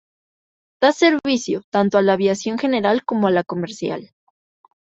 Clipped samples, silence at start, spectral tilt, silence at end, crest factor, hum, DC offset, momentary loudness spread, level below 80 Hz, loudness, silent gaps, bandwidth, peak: under 0.1%; 0.8 s; -5 dB/octave; 0.75 s; 18 dB; none; under 0.1%; 10 LU; -64 dBFS; -19 LUFS; 1.64-1.72 s; 8 kHz; -2 dBFS